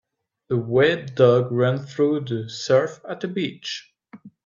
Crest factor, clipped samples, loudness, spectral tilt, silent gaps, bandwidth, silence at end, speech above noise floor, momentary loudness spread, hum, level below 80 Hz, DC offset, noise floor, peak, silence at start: 18 dB; under 0.1%; -22 LUFS; -6.5 dB/octave; none; 7.6 kHz; 0.15 s; 26 dB; 13 LU; none; -64 dBFS; under 0.1%; -47 dBFS; -4 dBFS; 0.5 s